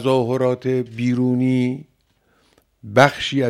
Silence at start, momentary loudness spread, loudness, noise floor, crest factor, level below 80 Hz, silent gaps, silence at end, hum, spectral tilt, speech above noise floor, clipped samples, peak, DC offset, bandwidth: 0 s; 7 LU; -19 LUFS; -62 dBFS; 20 dB; -56 dBFS; none; 0 s; none; -6.5 dB/octave; 44 dB; under 0.1%; 0 dBFS; under 0.1%; 14 kHz